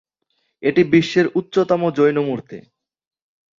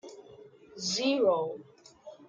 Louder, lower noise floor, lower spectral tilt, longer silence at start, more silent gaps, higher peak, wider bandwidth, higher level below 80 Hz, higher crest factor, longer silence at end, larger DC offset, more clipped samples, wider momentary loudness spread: first, -18 LUFS vs -29 LUFS; first, -70 dBFS vs -53 dBFS; first, -7 dB/octave vs -3 dB/octave; first, 0.6 s vs 0.05 s; neither; first, -2 dBFS vs -16 dBFS; second, 7.6 kHz vs 9.4 kHz; first, -62 dBFS vs -76 dBFS; about the same, 16 dB vs 16 dB; first, 1 s vs 0.15 s; neither; neither; second, 13 LU vs 25 LU